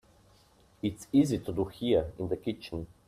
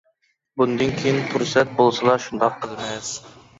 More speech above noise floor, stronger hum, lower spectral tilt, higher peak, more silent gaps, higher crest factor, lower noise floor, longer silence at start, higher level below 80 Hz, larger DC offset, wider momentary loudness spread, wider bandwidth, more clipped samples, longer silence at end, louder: second, 32 dB vs 46 dB; neither; first, -7 dB/octave vs -4.5 dB/octave; second, -14 dBFS vs -4 dBFS; neither; about the same, 18 dB vs 18 dB; second, -62 dBFS vs -67 dBFS; first, 0.85 s vs 0.55 s; about the same, -54 dBFS vs -56 dBFS; neither; about the same, 10 LU vs 12 LU; first, 14.5 kHz vs 8 kHz; neither; about the same, 0.25 s vs 0.3 s; second, -31 LUFS vs -21 LUFS